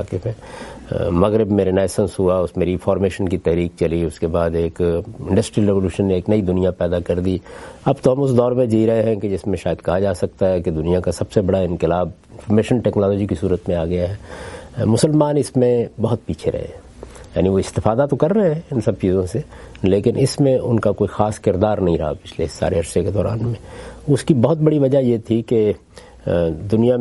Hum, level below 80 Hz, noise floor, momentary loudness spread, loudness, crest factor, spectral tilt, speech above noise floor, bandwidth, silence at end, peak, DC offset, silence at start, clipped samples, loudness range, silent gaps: none; -42 dBFS; -38 dBFS; 10 LU; -19 LUFS; 18 dB; -7.5 dB/octave; 20 dB; 11.5 kHz; 0 s; 0 dBFS; under 0.1%; 0 s; under 0.1%; 2 LU; none